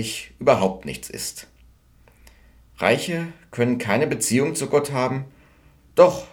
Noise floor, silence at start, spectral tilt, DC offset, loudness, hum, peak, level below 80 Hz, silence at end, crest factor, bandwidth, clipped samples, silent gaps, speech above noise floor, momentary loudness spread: -54 dBFS; 0 s; -4.5 dB/octave; under 0.1%; -22 LUFS; none; -2 dBFS; -54 dBFS; 0.05 s; 22 dB; 19 kHz; under 0.1%; none; 33 dB; 14 LU